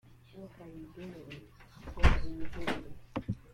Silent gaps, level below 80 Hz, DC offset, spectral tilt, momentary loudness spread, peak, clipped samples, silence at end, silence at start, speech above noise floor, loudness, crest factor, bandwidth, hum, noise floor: none; -38 dBFS; under 0.1%; -6.5 dB/octave; 22 LU; -10 dBFS; under 0.1%; 0.15 s; 0.35 s; 13 dB; -36 LUFS; 24 dB; 10.5 kHz; none; -52 dBFS